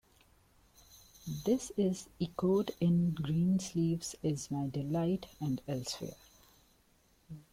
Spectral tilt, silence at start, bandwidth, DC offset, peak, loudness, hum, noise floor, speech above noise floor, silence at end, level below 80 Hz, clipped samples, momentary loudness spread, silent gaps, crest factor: -6.5 dB/octave; 0.95 s; 16 kHz; under 0.1%; -20 dBFS; -34 LUFS; none; -69 dBFS; 35 dB; 0.1 s; -64 dBFS; under 0.1%; 11 LU; none; 16 dB